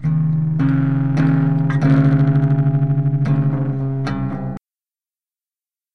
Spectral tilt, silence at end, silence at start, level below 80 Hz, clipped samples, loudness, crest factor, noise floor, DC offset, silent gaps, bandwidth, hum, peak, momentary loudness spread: -10 dB/octave; 0 s; 0 s; -44 dBFS; under 0.1%; -17 LUFS; 14 dB; under -90 dBFS; 1%; none; 5.8 kHz; none; -2 dBFS; 9 LU